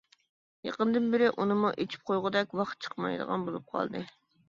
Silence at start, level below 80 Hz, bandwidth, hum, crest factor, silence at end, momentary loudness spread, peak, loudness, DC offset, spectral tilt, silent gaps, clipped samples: 0.65 s; -74 dBFS; 7.4 kHz; none; 18 dB; 0.4 s; 10 LU; -12 dBFS; -31 LUFS; under 0.1%; -6.5 dB/octave; none; under 0.1%